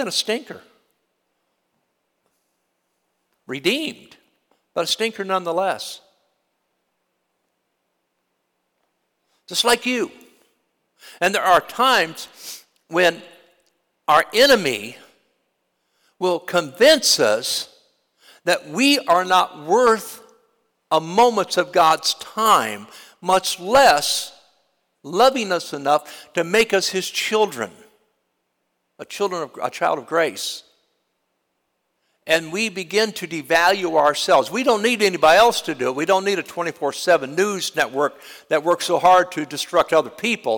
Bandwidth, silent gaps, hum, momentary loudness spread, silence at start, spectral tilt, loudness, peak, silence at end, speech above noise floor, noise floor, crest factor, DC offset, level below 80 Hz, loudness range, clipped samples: 19 kHz; none; none; 14 LU; 0 s; -2.5 dB/octave; -19 LUFS; -4 dBFS; 0 s; 54 dB; -73 dBFS; 16 dB; under 0.1%; -62 dBFS; 8 LU; under 0.1%